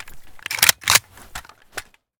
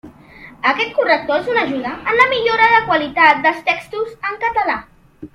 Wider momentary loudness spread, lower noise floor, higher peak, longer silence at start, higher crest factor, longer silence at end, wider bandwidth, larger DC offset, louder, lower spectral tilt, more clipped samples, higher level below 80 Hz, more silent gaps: first, 22 LU vs 10 LU; about the same, -39 dBFS vs -41 dBFS; about the same, 0 dBFS vs 0 dBFS; about the same, 0 s vs 0.05 s; first, 24 dB vs 16 dB; first, 0.4 s vs 0.1 s; first, over 20 kHz vs 11.5 kHz; neither; about the same, -16 LUFS vs -15 LUFS; second, 1 dB/octave vs -4.5 dB/octave; neither; about the same, -50 dBFS vs -52 dBFS; neither